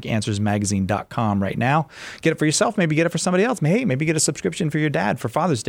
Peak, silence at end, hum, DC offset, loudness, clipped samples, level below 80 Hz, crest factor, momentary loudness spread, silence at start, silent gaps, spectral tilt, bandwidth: -4 dBFS; 0 s; none; under 0.1%; -21 LUFS; under 0.1%; -54 dBFS; 16 dB; 4 LU; 0 s; none; -5 dB/octave; 16.5 kHz